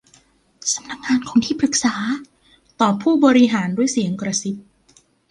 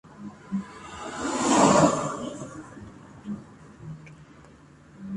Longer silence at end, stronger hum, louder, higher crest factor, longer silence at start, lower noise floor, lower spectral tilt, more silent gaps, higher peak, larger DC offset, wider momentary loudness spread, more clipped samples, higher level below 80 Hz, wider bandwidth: first, 0.7 s vs 0 s; neither; first, -19 LUFS vs -24 LUFS; about the same, 18 dB vs 22 dB; first, 0.65 s vs 0.1 s; first, -56 dBFS vs -51 dBFS; about the same, -4 dB/octave vs -4.5 dB/octave; neither; first, -2 dBFS vs -6 dBFS; neither; second, 11 LU vs 26 LU; neither; about the same, -58 dBFS vs -56 dBFS; about the same, 11.5 kHz vs 11.5 kHz